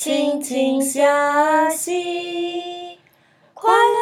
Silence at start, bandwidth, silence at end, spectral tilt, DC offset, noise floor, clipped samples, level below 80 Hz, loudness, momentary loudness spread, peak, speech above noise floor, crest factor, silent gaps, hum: 0 s; 17 kHz; 0 s; -1.5 dB/octave; under 0.1%; -56 dBFS; under 0.1%; -80 dBFS; -19 LUFS; 13 LU; -2 dBFS; 37 dB; 18 dB; none; none